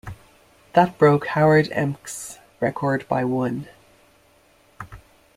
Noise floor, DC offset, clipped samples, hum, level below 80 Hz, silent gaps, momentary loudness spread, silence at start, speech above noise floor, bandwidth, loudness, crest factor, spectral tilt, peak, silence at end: -57 dBFS; under 0.1%; under 0.1%; none; -54 dBFS; none; 24 LU; 0.05 s; 37 dB; 15 kHz; -21 LUFS; 20 dB; -6.5 dB/octave; -2 dBFS; 0.4 s